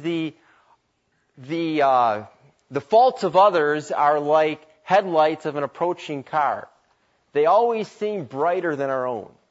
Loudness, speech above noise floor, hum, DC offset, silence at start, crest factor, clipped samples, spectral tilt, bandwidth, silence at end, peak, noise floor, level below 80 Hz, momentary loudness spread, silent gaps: -21 LUFS; 48 dB; none; under 0.1%; 0 s; 18 dB; under 0.1%; -6 dB/octave; 8 kHz; 0.25 s; -4 dBFS; -69 dBFS; -74 dBFS; 13 LU; none